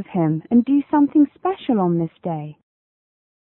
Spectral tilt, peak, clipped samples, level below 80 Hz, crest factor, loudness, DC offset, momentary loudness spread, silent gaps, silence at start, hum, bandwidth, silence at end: -13 dB/octave; -6 dBFS; under 0.1%; -60 dBFS; 14 dB; -19 LUFS; under 0.1%; 11 LU; none; 0 s; none; 4 kHz; 0.95 s